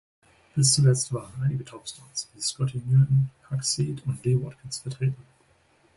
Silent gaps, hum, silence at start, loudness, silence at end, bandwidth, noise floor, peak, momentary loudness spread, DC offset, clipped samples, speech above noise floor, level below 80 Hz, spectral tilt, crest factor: none; none; 0.55 s; -26 LUFS; 0.75 s; 11.5 kHz; -63 dBFS; -8 dBFS; 14 LU; under 0.1%; under 0.1%; 37 dB; -58 dBFS; -5 dB/octave; 18 dB